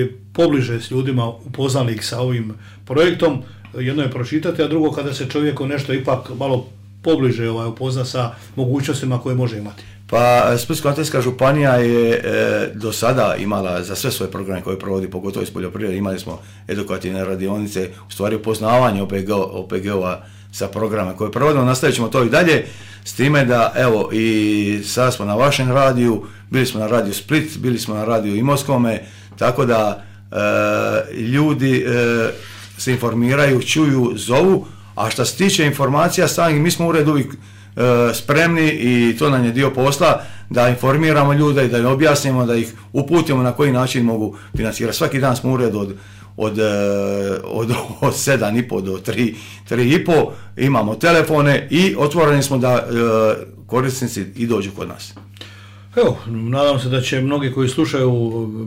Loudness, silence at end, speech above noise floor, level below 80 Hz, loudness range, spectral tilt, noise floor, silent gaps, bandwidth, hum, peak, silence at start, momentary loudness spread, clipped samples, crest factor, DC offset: -17 LUFS; 0 s; 22 dB; -48 dBFS; 5 LU; -5.5 dB/octave; -39 dBFS; none; 16 kHz; none; -6 dBFS; 0 s; 10 LU; under 0.1%; 12 dB; under 0.1%